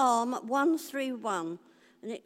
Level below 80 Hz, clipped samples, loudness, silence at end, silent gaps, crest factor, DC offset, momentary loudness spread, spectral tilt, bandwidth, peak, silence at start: under -90 dBFS; under 0.1%; -31 LUFS; 0.05 s; none; 16 dB; under 0.1%; 15 LU; -4 dB/octave; 16 kHz; -14 dBFS; 0 s